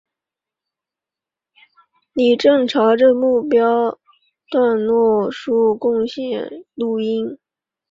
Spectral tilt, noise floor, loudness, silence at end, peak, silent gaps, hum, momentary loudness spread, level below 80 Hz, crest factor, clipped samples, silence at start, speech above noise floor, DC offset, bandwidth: -6 dB/octave; -88 dBFS; -17 LUFS; 0.55 s; -2 dBFS; none; none; 12 LU; -62 dBFS; 16 dB; under 0.1%; 2.15 s; 71 dB; under 0.1%; 7.6 kHz